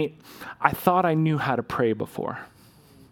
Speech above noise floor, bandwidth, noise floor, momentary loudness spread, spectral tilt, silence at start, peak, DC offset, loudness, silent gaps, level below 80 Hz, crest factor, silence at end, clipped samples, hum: 28 dB; 18 kHz; -53 dBFS; 16 LU; -7 dB/octave; 0 s; -2 dBFS; under 0.1%; -24 LUFS; none; -58 dBFS; 24 dB; 0.65 s; under 0.1%; none